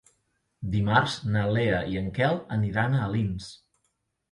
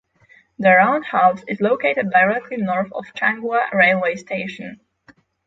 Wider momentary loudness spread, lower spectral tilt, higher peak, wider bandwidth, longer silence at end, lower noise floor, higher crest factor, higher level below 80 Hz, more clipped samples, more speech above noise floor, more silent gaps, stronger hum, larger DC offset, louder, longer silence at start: second, 8 LU vs 12 LU; about the same, -6.5 dB/octave vs -6.5 dB/octave; second, -6 dBFS vs -2 dBFS; first, 11 kHz vs 7.8 kHz; about the same, 0.75 s vs 0.7 s; first, -76 dBFS vs -54 dBFS; about the same, 20 dB vs 18 dB; first, -48 dBFS vs -64 dBFS; neither; first, 50 dB vs 36 dB; neither; neither; neither; second, -26 LUFS vs -18 LUFS; about the same, 0.6 s vs 0.6 s